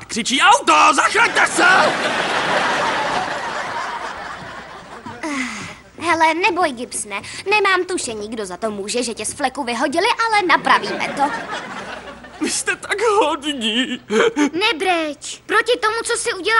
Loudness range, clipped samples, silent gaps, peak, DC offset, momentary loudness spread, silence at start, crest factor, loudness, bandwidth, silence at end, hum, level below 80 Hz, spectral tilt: 6 LU; under 0.1%; none; 0 dBFS; under 0.1%; 17 LU; 0 s; 18 dB; -17 LUFS; 16 kHz; 0 s; none; -54 dBFS; -2 dB/octave